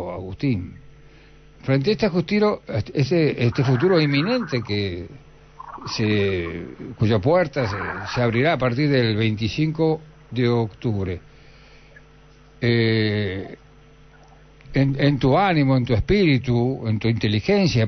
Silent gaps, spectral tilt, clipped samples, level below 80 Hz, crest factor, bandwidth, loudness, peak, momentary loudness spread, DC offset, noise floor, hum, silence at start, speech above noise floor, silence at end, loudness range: none; -7.5 dB/octave; under 0.1%; -44 dBFS; 14 dB; 6.4 kHz; -21 LUFS; -6 dBFS; 12 LU; under 0.1%; -49 dBFS; none; 0 s; 29 dB; 0 s; 5 LU